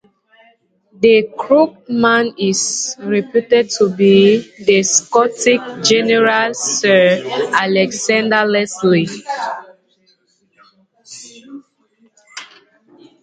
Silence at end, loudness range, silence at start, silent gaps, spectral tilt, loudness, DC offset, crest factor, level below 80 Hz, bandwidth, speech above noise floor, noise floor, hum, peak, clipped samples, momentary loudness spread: 0.75 s; 8 LU; 1 s; none; -3.5 dB/octave; -14 LUFS; under 0.1%; 16 dB; -62 dBFS; 9.4 kHz; 45 dB; -58 dBFS; none; 0 dBFS; under 0.1%; 13 LU